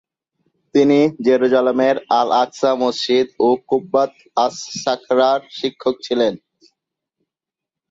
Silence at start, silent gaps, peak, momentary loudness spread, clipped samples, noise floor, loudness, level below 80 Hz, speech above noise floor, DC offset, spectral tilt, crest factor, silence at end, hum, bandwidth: 0.75 s; none; -2 dBFS; 7 LU; under 0.1%; -86 dBFS; -17 LUFS; -64 dBFS; 69 dB; under 0.1%; -4.5 dB/octave; 16 dB; 1.55 s; none; 7.8 kHz